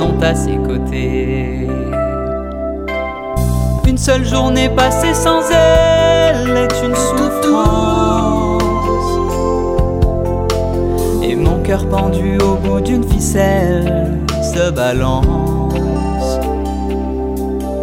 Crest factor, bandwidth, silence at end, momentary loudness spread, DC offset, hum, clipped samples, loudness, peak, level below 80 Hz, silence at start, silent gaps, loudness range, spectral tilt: 14 dB; 16.5 kHz; 0 s; 7 LU; under 0.1%; none; under 0.1%; -15 LUFS; 0 dBFS; -22 dBFS; 0 s; none; 5 LU; -6 dB/octave